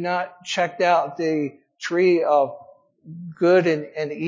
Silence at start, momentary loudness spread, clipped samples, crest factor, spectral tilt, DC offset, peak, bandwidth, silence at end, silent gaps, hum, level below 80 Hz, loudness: 0 s; 13 LU; under 0.1%; 16 dB; -5.5 dB/octave; under 0.1%; -6 dBFS; 7.6 kHz; 0 s; none; none; -76 dBFS; -21 LUFS